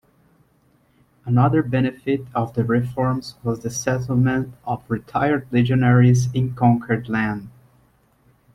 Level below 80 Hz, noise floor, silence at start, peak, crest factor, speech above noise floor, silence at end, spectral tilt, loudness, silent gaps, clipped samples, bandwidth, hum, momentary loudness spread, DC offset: -52 dBFS; -60 dBFS; 1.25 s; -4 dBFS; 16 dB; 40 dB; 1.05 s; -7 dB/octave; -20 LUFS; none; under 0.1%; 12 kHz; none; 10 LU; under 0.1%